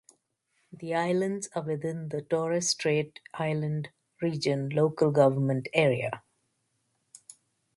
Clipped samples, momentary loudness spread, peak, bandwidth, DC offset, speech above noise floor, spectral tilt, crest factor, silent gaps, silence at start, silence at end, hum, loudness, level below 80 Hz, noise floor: under 0.1%; 12 LU; -8 dBFS; 11.5 kHz; under 0.1%; 48 dB; -5 dB/octave; 22 dB; none; 0.75 s; 1.6 s; none; -28 LUFS; -70 dBFS; -76 dBFS